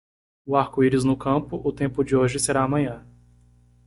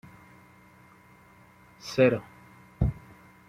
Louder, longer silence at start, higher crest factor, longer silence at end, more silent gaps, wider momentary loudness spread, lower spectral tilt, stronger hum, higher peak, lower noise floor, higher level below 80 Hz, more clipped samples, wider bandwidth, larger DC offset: first, -23 LUFS vs -27 LUFS; second, 0.45 s vs 1.85 s; about the same, 18 dB vs 22 dB; first, 0.9 s vs 0.5 s; neither; second, 9 LU vs 24 LU; about the same, -6 dB/octave vs -7 dB/octave; first, 60 Hz at -40 dBFS vs none; first, -6 dBFS vs -10 dBFS; about the same, -56 dBFS vs -56 dBFS; second, -50 dBFS vs -44 dBFS; neither; second, 11.5 kHz vs 15 kHz; neither